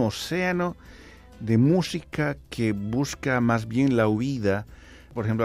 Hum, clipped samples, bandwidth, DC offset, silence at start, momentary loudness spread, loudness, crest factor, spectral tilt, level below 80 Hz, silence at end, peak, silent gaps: none; under 0.1%; 15 kHz; under 0.1%; 0 s; 10 LU; -25 LUFS; 16 dB; -6.5 dB/octave; -50 dBFS; 0 s; -10 dBFS; none